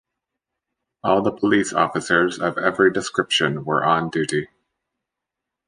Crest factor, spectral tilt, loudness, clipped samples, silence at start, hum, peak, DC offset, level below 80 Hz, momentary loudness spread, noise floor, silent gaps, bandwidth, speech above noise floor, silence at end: 20 dB; -4.5 dB/octave; -20 LUFS; under 0.1%; 1.05 s; none; -2 dBFS; under 0.1%; -58 dBFS; 6 LU; -84 dBFS; none; 10.5 kHz; 64 dB; 1.25 s